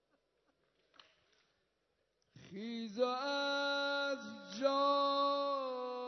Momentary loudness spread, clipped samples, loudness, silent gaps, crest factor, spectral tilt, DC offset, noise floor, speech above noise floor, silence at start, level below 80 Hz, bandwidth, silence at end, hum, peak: 13 LU; under 0.1%; -36 LUFS; none; 18 dB; -1 dB/octave; under 0.1%; -82 dBFS; 46 dB; 2.35 s; under -90 dBFS; 6.2 kHz; 0 s; none; -22 dBFS